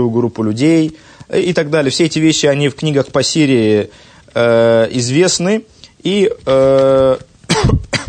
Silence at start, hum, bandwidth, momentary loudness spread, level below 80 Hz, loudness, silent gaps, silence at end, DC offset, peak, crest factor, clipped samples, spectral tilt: 0 s; none; 9.6 kHz; 7 LU; -34 dBFS; -13 LUFS; none; 0 s; under 0.1%; 0 dBFS; 12 dB; under 0.1%; -5 dB/octave